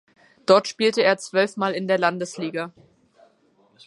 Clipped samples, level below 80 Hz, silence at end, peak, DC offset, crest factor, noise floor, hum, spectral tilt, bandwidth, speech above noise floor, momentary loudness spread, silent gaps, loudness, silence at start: under 0.1%; -74 dBFS; 1.15 s; -2 dBFS; under 0.1%; 20 dB; -61 dBFS; none; -4 dB/octave; 11.5 kHz; 40 dB; 12 LU; none; -22 LUFS; 0.5 s